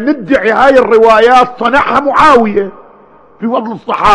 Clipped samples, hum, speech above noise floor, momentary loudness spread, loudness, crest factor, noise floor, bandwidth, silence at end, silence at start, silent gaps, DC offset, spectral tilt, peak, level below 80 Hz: 5%; none; 32 dB; 11 LU; -8 LUFS; 8 dB; -40 dBFS; 11 kHz; 0 s; 0 s; none; under 0.1%; -5 dB/octave; 0 dBFS; -36 dBFS